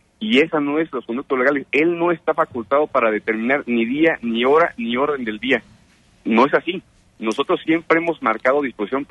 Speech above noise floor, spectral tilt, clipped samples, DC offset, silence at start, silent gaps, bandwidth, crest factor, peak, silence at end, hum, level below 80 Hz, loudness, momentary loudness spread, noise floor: 35 dB; -6 dB/octave; under 0.1%; under 0.1%; 0.2 s; none; 10 kHz; 16 dB; -4 dBFS; 0.05 s; none; -60 dBFS; -19 LUFS; 7 LU; -53 dBFS